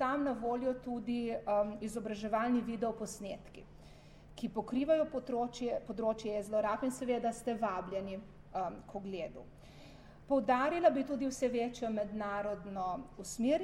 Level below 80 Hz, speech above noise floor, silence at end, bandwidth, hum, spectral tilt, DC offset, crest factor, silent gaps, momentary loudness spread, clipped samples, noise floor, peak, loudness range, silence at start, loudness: -60 dBFS; 20 dB; 0 s; 14 kHz; none; -5.5 dB/octave; under 0.1%; 20 dB; none; 14 LU; under 0.1%; -56 dBFS; -16 dBFS; 4 LU; 0 s; -36 LUFS